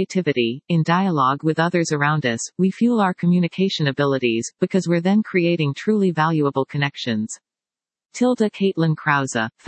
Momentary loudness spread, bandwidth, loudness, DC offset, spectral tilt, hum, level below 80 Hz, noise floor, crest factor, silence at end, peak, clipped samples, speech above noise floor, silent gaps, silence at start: 5 LU; 8.8 kHz; -20 LUFS; under 0.1%; -6 dB/octave; none; -70 dBFS; under -90 dBFS; 16 dB; 0.2 s; -2 dBFS; under 0.1%; over 70 dB; none; 0 s